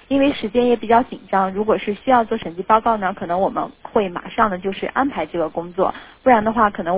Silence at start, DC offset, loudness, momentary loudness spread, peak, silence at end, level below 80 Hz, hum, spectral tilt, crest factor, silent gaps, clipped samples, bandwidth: 0.1 s; under 0.1%; -19 LUFS; 8 LU; 0 dBFS; 0 s; -48 dBFS; none; -9.5 dB/octave; 18 dB; none; under 0.1%; 4 kHz